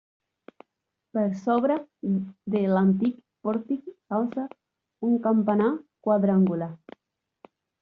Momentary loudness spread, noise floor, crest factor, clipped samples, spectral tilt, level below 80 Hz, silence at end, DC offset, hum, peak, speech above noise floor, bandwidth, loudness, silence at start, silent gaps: 11 LU; -83 dBFS; 16 dB; under 0.1%; -9 dB/octave; -70 dBFS; 1.05 s; under 0.1%; none; -10 dBFS; 58 dB; 4.1 kHz; -26 LUFS; 1.15 s; none